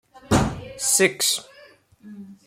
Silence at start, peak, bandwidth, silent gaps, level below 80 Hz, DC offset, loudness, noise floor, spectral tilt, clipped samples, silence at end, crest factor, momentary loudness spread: 0.3 s; -4 dBFS; 16.5 kHz; none; -42 dBFS; under 0.1%; -21 LUFS; -51 dBFS; -3 dB/octave; under 0.1%; 0.15 s; 20 dB; 17 LU